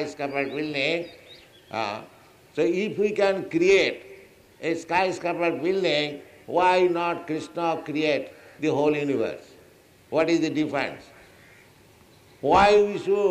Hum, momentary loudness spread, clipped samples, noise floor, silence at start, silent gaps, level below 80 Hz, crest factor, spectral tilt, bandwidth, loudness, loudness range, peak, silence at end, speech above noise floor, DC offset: none; 12 LU; under 0.1%; -54 dBFS; 0 s; none; -56 dBFS; 18 dB; -5 dB/octave; 13.5 kHz; -24 LUFS; 3 LU; -6 dBFS; 0 s; 31 dB; under 0.1%